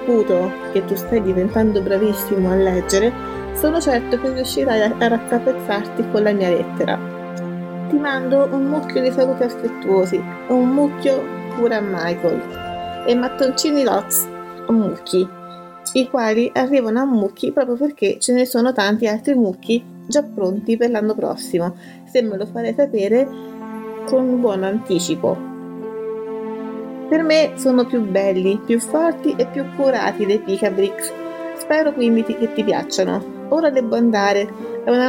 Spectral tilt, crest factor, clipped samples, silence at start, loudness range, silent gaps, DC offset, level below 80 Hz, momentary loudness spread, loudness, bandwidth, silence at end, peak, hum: -5 dB/octave; 16 dB; under 0.1%; 0 s; 2 LU; none; under 0.1%; -46 dBFS; 11 LU; -19 LUFS; 17.5 kHz; 0 s; -4 dBFS; none